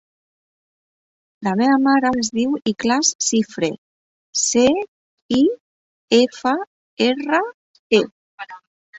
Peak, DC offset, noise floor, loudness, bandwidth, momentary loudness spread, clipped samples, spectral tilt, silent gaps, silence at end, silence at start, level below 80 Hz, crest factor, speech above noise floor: -2 dBFS; under 0.1%; under -90 dBFS; -19 LUFS; 8.2 kHz; 18 LU; under 0.1%; -3 dB/octave; 3.15-3.19 s, 3.78-4.33 s, 4.88-5.29 s, 5.60-6.08 s, 6.67-6.97 s, 7.54-7.90 s, 8.11-8.38 s, 8.67-8.93 s; 0 s; 1.4 s; -58 dBFS; 18 dB; over 72 dB